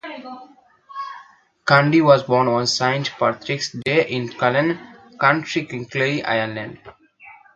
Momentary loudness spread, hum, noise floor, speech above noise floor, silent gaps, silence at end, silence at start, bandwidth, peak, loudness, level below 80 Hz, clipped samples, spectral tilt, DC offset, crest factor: 19 LU; none; -48 dBFS; 29 dB; none; 0.25 s; 0.05 s; 9.2 kHz; 0 dBFS; -19 LUFS; -62 dBFS; under 0.1%; -5 dB/octave; under 0.1%; 20 dB